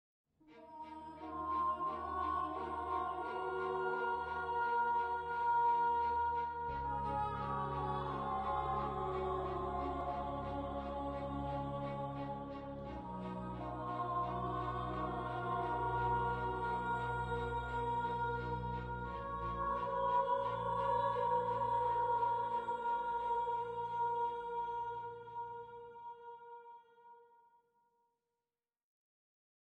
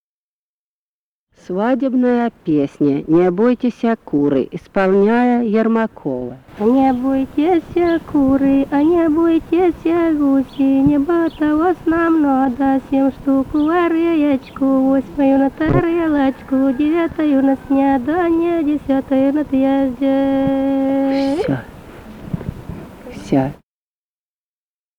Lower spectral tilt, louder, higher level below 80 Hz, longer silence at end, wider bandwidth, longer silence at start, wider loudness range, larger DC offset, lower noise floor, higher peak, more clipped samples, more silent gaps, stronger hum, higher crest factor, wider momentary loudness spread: about the same, -7.5 dB/octave vs -8.5 dB/octave; second, -38 LUFS vs -16 LUFS; second, -56 dBFS vs -42 dBFS; first, 2.5 s vs 1.45 s; first, 9 kHz vs 6.6 kHz; second, 0.45 s vs 1.5 s; first, 7 LU vs 4 LU; neither; about the same, under -90 dBFS vs under -90 dBFS; second, -24 dBFS vs -2 dBFS; neither; neither; neither; about the same, 14 dB vs 14 dB; first, 12 LU vs 6 LU